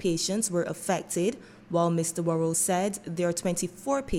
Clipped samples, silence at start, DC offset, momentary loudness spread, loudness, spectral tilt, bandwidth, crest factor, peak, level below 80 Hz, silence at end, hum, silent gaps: under 0.1%; 0 s; under 0.1%; 6 LU; -28 LUFS; -4.5 dB/octave; 16.5 kHz; 16 dB; -12 dBFS; -50 dBFS; 0 s; none; none